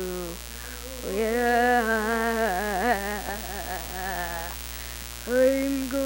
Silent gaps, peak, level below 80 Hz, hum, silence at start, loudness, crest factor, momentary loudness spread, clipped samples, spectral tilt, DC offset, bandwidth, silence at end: none; -10 dBFS; -42 dBFS; 60 Hz at -40 dBFS; 0 s; -27 LUFS; 18 dB; 13 LU; under 0.1%; -3.5 dB/octave; under 0.1%; over 20 kHz; 0 s